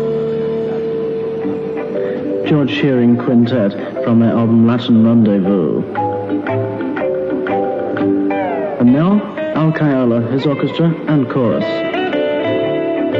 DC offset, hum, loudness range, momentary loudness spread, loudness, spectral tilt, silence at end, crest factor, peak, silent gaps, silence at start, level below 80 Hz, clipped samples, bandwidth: under 0.1%; none; 4 LU; 8 LU; -15 LUFS; -9.5 dB/octave; 0 s; 12 dB; -2 dBFS; none; 0 s; -52 dBFS; under 0.1%; 5.8 kHz